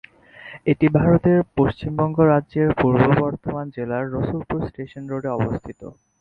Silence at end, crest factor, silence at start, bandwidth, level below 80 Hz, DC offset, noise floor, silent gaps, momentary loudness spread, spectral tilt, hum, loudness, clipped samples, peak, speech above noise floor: 0.3 s; 18 dB; 0.4 s; 4.8 kHz; -44 dBFS; under 0.1%; -43 dBFS; none; 14 LU; -10.5 dB/octave; none; -20 LUFS; under 0.1%; -2 dBFS; 23 dB